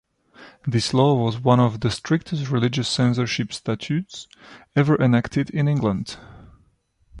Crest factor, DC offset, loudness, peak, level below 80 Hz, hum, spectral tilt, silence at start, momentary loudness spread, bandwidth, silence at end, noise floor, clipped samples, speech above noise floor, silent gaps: 18 dB; under 0.1%; -21 LUFS; -4 dBFS; -50 dBFS; none; -6.5 dB/octave; 0.4 s; 12 LU; 11 kHz; 0 s; -62 dBFS; under 0.1%; 41 dB; none